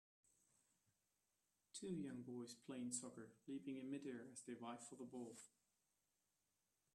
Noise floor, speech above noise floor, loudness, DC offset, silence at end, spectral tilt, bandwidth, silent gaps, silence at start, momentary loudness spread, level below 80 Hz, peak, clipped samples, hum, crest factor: -89 dBFS; 37 dB; -53 LUFS; under 0.1%; 1.5 s; -4.5 dB/octave; 13 kHz; none; 1.75 s; 9 LU; under -90 dBFS; -34 dBFS; under 0.1%; 50 Hz at -95 dBFS; 22 dB